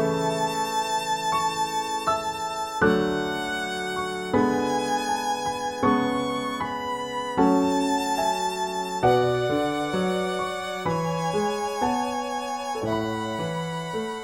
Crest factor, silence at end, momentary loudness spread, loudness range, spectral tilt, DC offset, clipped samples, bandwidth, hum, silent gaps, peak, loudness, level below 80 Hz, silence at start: 18 dB; 0 s; 7 LU; 3 LU; -4.5 dB/octave; under 0.1%; under 0.1%; 17 kHz; none; none; -8 dBFS; -25 LUFS; -54 dBFS; 0 s